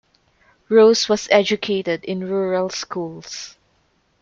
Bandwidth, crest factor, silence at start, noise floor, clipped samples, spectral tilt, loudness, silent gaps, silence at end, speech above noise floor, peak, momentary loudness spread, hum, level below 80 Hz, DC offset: 7.6 kHz; 18 dB; 0.7 s; -63 dBFS; under 0.1%; -4 dB/octave; -18 LUFS; none; 0.75 s; 45 dB; -2 dBFS; 18 LU; none; -62 dBFS; under 0.1%